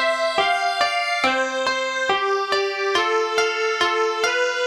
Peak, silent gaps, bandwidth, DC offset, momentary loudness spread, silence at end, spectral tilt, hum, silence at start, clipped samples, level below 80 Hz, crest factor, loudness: -6 dBFS; none; 14.5 kHz; under 0.1%; 2 LU; 0 s; -1 dB/octave; none; 0 s; under 0.1%; -62 dBFS; 16 dB; -20 LUFS